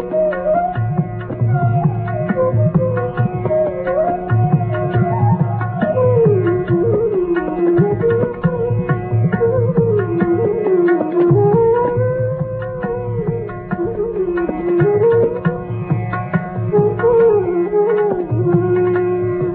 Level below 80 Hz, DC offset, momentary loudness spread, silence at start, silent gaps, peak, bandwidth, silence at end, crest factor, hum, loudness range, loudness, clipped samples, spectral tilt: -40 dBFS; under 0.1%; 8 LU; 0 s; none; -2 dBFS; 3.8 kHz; 0 s; 14 dB; none; 3 LU; -16 LUFS; under 0.1%; -9.5 dB/octave